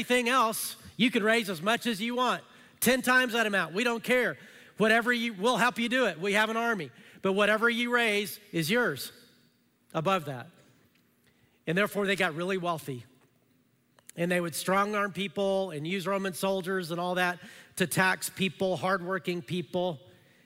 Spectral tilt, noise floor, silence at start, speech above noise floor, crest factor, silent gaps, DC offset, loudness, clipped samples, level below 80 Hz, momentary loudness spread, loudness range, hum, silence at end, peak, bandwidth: -4 dB/octave; -68 dBFS; 0 s; 39 dB; 18 dB; none; under 0.1%; -28 LUFS; under 0.1%; -70 dBFS; 10 LU; 6 LU; none; 0.5 s; -10 dBFS; 16 kHz